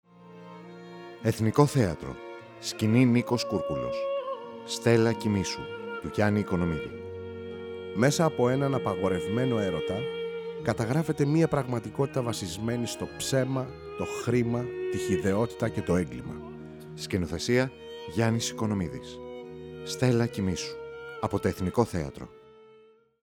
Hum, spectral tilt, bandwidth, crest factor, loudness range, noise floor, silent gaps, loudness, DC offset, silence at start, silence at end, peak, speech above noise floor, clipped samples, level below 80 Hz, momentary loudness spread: none; -6 dB/octave; 17.5 kHz; 22 dB; 3 LU; -58 dBFS; none; -28 LUFS; under 0.1%; 0.2 s; 0.55 s; -6 dBFS; 31 dB; under 0.1%; -54 dBFS; 17 LU